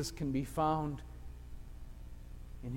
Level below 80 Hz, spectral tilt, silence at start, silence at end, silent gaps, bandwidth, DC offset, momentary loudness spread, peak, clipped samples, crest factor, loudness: -48 dBFS; -6 dB/octave; 0 s; 0 s; none; 16.5 kHz; under 0.1%; 20 LU; -22 dBFS; under 0.1%; 18 dB; -36 LUFS